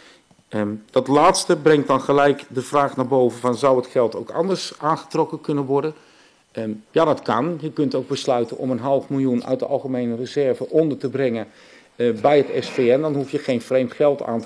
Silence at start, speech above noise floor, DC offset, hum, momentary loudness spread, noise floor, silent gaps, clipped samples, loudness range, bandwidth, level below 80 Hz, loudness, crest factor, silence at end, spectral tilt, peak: 0.5 s; 32 dB; under 0.1%; none; 8 LU; -51 dBFS; none; under 0.1%; 5 LU; 11 kHz; -60 dBFS; -20 LUFS; 14 dB; 0 s; -5.5 dB/octave; -6 dBFS